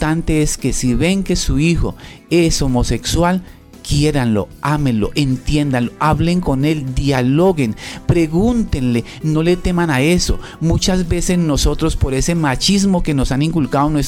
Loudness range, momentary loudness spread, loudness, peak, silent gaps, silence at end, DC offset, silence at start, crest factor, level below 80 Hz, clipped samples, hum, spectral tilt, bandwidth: 1 LU; 5 LU; -16 LUFS; -2 dBFS; none; 0 s; under 0.1%; 0 s; 12 dB; -24 dBFS; under 0.1%; none; -5.5 dB/octave; 16 kHz